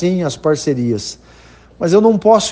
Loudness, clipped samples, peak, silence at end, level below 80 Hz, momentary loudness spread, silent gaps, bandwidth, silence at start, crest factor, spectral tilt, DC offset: -15 LUFS; under 0.1%; 0 dBFS; 0 s; -48 dBFS; 11 LU; none; 9.6 kHz; 0 s; 14 dB; -5.5 dB/octave; under 0.1%